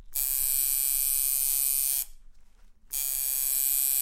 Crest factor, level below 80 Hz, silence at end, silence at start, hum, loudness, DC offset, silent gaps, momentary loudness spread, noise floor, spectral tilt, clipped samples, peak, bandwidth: 20 dB; -48 dBFS; 0 s; 0 s; none; -24 LUFS; under 0.1%; none; 6 LU; -52 dBFS; 3.5 dB/octave; under 0.1%; -8 dBFS; 17 kHz